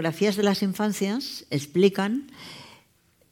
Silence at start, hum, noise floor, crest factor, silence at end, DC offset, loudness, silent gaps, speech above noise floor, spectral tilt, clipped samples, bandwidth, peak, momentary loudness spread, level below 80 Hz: 0 s; none; -63 dBFS; 20 dB; 0.6 s; under 0.1%; -25 LUFS; none; 38 dB; -5.5 dB/octave; under 0.1%; 17.5 kHz; -6 dBFS; 20 LU; -70 dBFS